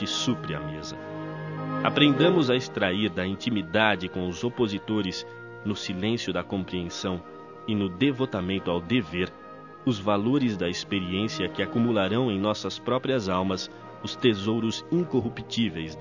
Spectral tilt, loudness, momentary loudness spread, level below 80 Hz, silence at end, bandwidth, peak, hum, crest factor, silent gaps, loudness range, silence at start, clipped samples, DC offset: -5.5 dB/octave; -27 LUFS; 12 LU; -52 dBFS; 0 s; 7.4 kHz; -4 dBFS; none; 22 dB; none; 5 LU; 0 s; under 0.1%; under 0.1%